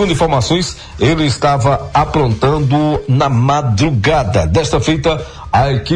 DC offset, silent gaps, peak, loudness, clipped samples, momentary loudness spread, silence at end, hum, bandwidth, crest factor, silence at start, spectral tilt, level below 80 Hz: under 0.1%; none; 0 dBFS; -14 LUFS; under 0.1%; 3 LU; 0 s; none; 10.5 kHz; 12 dB; 0 s; -6 dB/octave; -28 dBFS